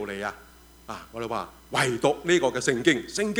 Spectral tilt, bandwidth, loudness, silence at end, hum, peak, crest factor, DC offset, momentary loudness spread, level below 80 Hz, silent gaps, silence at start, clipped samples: -4 dB/octave; over 20 kHz; -26 LUFS; 0 s; none; -4 dBFS; 22 dB; under 0.1%; 14 LU; -56 dBFS; none; 0 s; under 0.1%